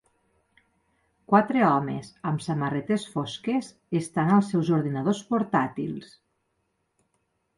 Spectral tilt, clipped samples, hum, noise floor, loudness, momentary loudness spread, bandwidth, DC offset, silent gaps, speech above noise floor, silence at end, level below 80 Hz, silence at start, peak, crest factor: -7 dB/octave; under 0.1%; none; -75 dBFS; -26 LUFS; 10 LU; 11.5 kHz; under 0.1%; none; 50 dB; 1.55 s; -66 dBFS; 1.3 s; -4 dBFS; 22 dB